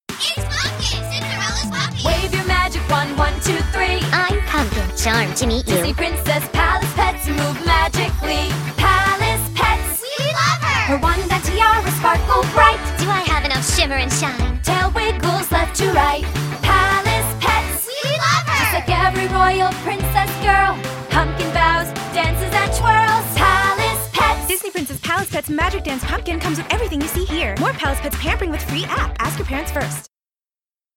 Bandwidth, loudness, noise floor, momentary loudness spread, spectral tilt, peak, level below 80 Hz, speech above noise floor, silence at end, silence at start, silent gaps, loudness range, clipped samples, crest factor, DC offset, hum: 17 kHz; -18 LUFS; under -90 dBFS; 7 LU; -4 dB/octave; 0 dBFS; -26 dBFS; over 70 dB; 0.95 s; 0.1 s; none; 5 LU; under 0.1%; 18 dB; under 0.1%; none